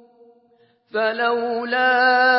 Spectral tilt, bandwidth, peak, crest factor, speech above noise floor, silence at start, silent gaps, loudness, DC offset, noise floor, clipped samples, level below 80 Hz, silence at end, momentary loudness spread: -7 dB/octave; 5.8 kHz; -6 dBFS; 14 dB; 41 dB; 0.95 s; none; -19 LUFS; under 0.1%; -59 dBFS; under 0.1%; -86 dBFS; 0 s; 8 LU